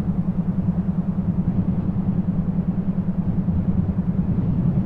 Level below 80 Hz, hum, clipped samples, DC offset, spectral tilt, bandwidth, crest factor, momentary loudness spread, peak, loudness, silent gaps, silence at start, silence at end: -34 dBFS; none; under 0.1%; under 0.1%; -12.5 dB/octave; 3.1 kHz; 12 dB; 2 LU; -8 dBFS; -23 LUFS; none; 0 s; 0 s